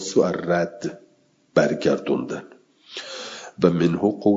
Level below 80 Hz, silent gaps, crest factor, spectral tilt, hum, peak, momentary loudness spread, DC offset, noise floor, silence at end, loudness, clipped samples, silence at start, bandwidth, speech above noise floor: -62 dBFS; none; 22 dB; -6 dB/octave; none; -2 dBFS; 14 LU; under 0.1%; -60 dBFS; 0 s; -23 LUFS; under 0.1%; 0 s; 7.8 kHz; 40 dB